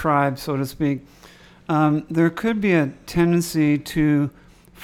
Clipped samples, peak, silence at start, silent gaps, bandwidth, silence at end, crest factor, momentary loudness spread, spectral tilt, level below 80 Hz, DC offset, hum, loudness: under 0.1%; -4 dBFS; 0 s; none; 16.5 kHz; 0 s; 16 dB; 7 LU; -6.5 dB/octave; -46 dBFS; under 0.1%; none; -21 LUFS